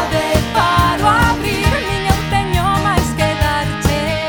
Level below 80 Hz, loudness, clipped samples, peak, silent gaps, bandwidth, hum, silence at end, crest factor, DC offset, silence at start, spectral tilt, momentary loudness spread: -24 dBFS; -15 LUFS; under 0.1%; 0 dBFS; none; over 20 kHz; none; 0 s; 14 dB; under 0.1%; 0 s; -5 dB/octave; 4 LU